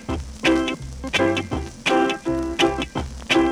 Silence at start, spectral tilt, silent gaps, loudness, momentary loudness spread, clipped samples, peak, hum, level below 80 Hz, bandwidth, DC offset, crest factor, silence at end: 0 s; -4.5 dB/octave; none; -22 LUFS; 10 LU; under 0.1%; -6 dBFS; none; -36 dBFS; 13.5 kHz; under 0.1%; 16 dB; 0 s